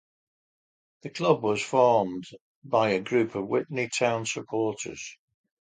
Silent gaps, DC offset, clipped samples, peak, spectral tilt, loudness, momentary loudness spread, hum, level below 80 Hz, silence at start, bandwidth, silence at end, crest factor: 2.41-2.62 s; under 0.1%; under 0.1%; -8 dBFS; -4.5 dB/octave; -26 LUFS; 17 LU; none; -68 dBFS; 1.05 s; 9.6 kHz; 0.5 s; 20 dB